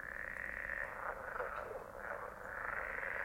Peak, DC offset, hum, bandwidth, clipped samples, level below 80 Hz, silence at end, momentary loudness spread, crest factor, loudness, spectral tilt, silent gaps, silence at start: -26 dBFS; under 0.1%; none; 16.5 kHz; under 0.1%; -60 dBFS; 0 s; 5 LU; 18 dB; -43 LUFS; -5 dB/octave; none; 0 s